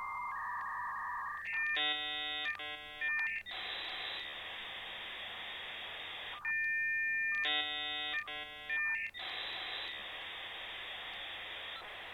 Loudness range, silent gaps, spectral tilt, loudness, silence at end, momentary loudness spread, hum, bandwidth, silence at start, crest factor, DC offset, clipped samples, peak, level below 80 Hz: 5 LU; none; -1.5 dB/octave; -37 LUFS; 0 s; 10 LU; none; 17 kHz; 0 s; 14 dB; under 0.1%; under 0.1%; -26 dBFS; -70 dBFS